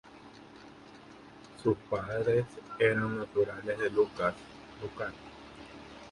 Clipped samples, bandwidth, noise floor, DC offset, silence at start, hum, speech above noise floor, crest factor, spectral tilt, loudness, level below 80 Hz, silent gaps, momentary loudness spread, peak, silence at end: under 0.1%; 11.5 kHz; -52 dBFS; under 0.1%; 0.05 s; none; 21 dB; 22 dB; -7 dB/octave; -32 LUFS; -62 dBFS; none; 23 LU; -10 dBFS; 0 s